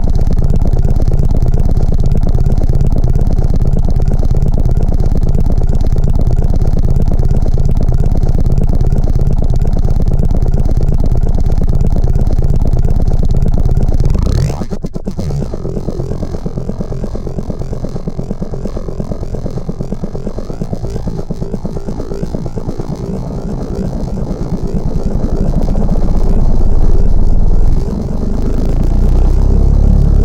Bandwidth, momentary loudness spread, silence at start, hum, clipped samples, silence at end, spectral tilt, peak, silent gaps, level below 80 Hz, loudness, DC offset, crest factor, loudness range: 7 kHz; 7 LU; 0 s; none; under 0.1%; 0 s; -9 dB/octave; 0 dBFS; none; -12 dBFS; -16 LUFS; under 0.1%; 10 dB; 7 LU